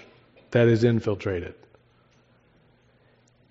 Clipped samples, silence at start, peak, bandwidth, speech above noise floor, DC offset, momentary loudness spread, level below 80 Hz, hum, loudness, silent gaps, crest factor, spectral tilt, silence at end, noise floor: under 0.1%; 0.5 s; -8 dBFS; 7.6 kHz; 39 dB; under 0.1%; 13 LU; -62 dBFS; none; -23 LUFS; none; 20 dB; -7 dB/octave; 2 s; -61 dBFS